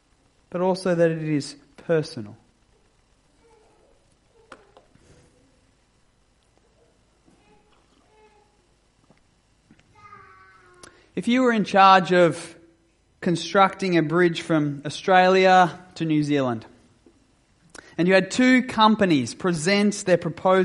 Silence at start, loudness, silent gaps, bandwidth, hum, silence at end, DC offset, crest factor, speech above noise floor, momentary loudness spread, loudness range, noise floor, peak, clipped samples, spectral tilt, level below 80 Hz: 0.55 s; -20 LUFS; none; 11.5 kHz; none; 0 s; under 0.1%; 22 dB; 43 dB; 18 LU; 11 LU; -63 dBFS; -2 dBFS; under 0.1%; -5.5 dB/octave; -64 dBFS